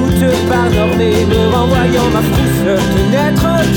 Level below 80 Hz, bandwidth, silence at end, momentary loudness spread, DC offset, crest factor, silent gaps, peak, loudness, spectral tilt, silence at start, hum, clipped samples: -24 dBFS; over 20 kHz; 0 s; 1 LU; under 0.1%; 10 dB; none; 0 dBFS; -12 LUFS; -6 dB/octave; 0 s; none; under 0.1%